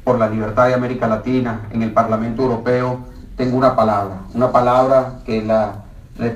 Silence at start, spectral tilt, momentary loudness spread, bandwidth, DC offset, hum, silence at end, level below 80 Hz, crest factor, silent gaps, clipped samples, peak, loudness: 0 s; -8 dB/octave; 10 LU; 12 kHz; under 0.1%; none; 0 s; -40 dBFS; 16 dB; none; under 0.1%; 0 dBFS; -17 LUFS